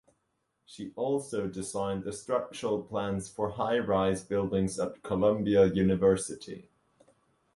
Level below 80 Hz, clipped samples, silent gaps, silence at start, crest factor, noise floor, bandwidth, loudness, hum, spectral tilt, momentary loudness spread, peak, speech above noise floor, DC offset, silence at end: -56 dBFS; under 0.1%; none; 0.7 s; 18 dB; -78 dBFS; 11.5 kHz; -30 LUFS; none; -6 dB/octave; 11 LU; -12 dBFS; 49 dB; under 0.1%; 0.95 s